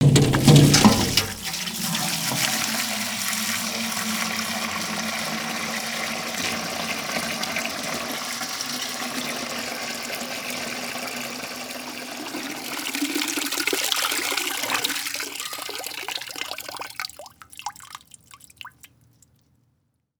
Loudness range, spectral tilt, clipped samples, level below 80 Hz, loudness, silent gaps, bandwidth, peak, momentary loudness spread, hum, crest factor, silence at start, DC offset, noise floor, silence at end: 10 LU; -3.5 dB/octave; under 0.1%; -48 dBFS; -24 LUFS; none; over 20 kHz; 0 dBFS; 12 LU; none; 24 dB; 0 s; under 0.1%; -70 dBFS; 1.35 s